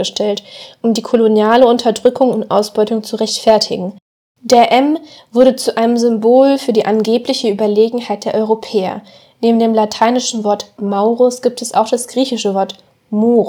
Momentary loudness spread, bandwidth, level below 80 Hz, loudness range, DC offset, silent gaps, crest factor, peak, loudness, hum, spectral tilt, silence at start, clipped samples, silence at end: 10 LU; 19 kHz; -60 dBFS; 3 LU; under 0.1%; 4.02-4.35 s; 14 dB; 0 dBFS; -14 LUFS; none; -4.5 dB/octave; 0 s; 0.2%; 0 s